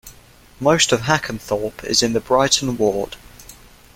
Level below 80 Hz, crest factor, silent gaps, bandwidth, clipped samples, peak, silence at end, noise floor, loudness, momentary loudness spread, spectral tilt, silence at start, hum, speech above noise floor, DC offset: -46 dBFS; 20 dB; none; 17 kHz; under 0.1%; 0 dBFS; 0.4 s; -47 dBFS; -18 LUFS; 9 LU; -3 dB/octave; 0.05 s; none; 28 dB; under 0.1%